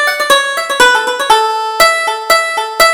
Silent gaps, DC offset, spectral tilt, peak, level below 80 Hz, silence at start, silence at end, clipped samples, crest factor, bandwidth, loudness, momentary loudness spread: none; under 0.1%; 0.5 dB/octave; 0 dBFS; -44 dBFS; 0 s; 0 s; 0.2%; 12 dB; over 20 kHz; -10 LUFS; 6 LU